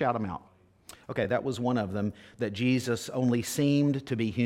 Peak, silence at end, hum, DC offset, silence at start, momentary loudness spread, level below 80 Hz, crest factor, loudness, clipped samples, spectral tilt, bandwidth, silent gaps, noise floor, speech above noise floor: -12 dBFS; 0 s; none; under 0.1%; 0 s; 10 LU; -62 dBFS; 16 dB; -29 LUFS; under 0.1%; -6 dB/octave; 16.5 kHz; none; -54 dBFS; 25 dB